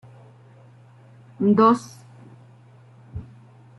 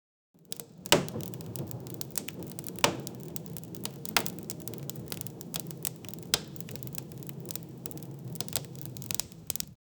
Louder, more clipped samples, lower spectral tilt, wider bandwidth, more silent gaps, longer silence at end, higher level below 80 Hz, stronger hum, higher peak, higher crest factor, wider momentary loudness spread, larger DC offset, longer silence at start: first, -19 LUFS vs -34 LUFS; neither; first, -7.5 dB/octave vs -3 dB/octave; second, 12 kHz vs over 20 kHz; neither; first, 0.55 s vs 0.25 s; about the same, -58 dBFS vs -62 dBFS; neither; about the same, -6 dBFS vs -4 dBFS; second, 20 dB vs 32 dB; first, 23 LU vs 12 LU; neither; first, 1.4 s vs 0.4 s